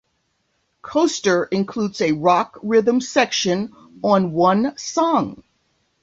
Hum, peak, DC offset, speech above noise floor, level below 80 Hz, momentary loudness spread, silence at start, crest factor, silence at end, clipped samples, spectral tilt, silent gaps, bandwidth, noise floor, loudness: none; -2 dBFS; under 0.1%; 50 dB; -60 dBFS; 7 LU; 0.85 s; 18 dB; 0.7 s; under 0.1%; -4.5 dB/octave; none; 8 kHz; -69 dBFS; -19 LUFS